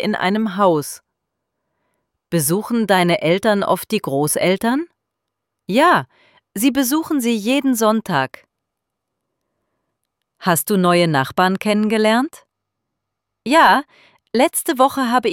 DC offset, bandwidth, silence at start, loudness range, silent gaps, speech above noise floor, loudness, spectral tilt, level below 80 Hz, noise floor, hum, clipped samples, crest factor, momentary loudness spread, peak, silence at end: under 0.1%; 17.5 kHz; 0 s; 3 LU; none; 63 dB; -17 LUFS; -4.5 dB/octave; -62 dBFS; -79 dBFS; none; under 0.1%; 16 dB; 9 LU; -2 dBFS; 0 s